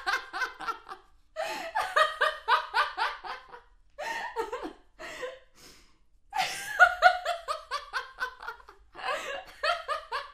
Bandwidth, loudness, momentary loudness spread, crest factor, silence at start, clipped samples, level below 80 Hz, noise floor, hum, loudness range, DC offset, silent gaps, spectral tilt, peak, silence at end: 15 kHz; -29 LUFS; 19 LU; 26 dB; 0 s; under 0.1%; -62 dBFS; -62 dBFS; none; 9 LU; under 0.1%; none; -0.5 dB/octave; -6 dBFS; 0 s